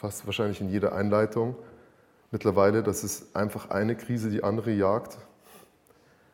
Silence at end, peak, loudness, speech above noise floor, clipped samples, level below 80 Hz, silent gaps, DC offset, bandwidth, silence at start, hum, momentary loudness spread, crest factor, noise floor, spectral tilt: 0.75 s; -10 dBFS; -28 LUFS; 34 dB; under 0.1%; -62 dBFS; none; under 0.1%; 17 kHz; 0 s; none; 9 LU; 18 dB; -61 dBFS; -6 dB/octave